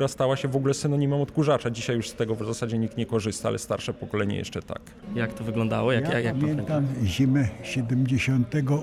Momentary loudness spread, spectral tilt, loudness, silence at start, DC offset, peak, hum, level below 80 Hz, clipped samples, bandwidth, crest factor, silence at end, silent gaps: 7 LU; -6.5 dB/octave; -26 LUFS; 0 s; under 0.1%; -10 dBFS; none; -52 dBFS; under 0.1%; 14 kHz; 14 dB; 0 s; none